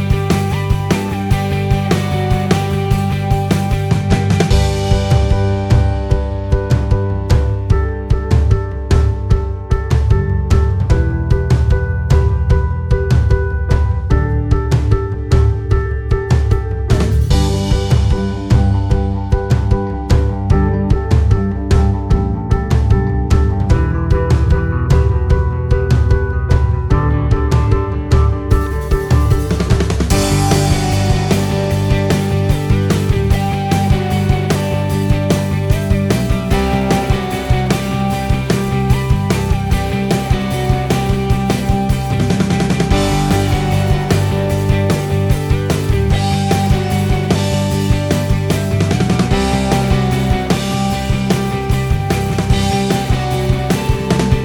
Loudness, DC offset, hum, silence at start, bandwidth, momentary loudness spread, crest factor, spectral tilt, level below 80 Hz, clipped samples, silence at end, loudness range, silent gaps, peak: -15 LUFS; under 0.1%; none; 0 s; 19.5 kHz; 3 LU; 14 dB; -6.5 dB/octave; -20 dBFS; under 0.1%; 0 s; 1 LU; none; 0 dBFS